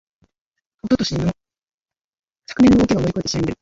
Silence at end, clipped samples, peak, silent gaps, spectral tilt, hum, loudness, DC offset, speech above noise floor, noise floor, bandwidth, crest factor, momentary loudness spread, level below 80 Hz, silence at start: 0.1 s; under 0.1%; -4 dBFS; 1.74-1.86 s, 2.04-2.13 s, 2.19-2.23 s; -6 dB/octave; none; -18 LUFS; under 0.1%; 64 dB; -80 dBFS; 7.8 kHz; 16 dB; 19 LU; -40 dBFS; 0.85 s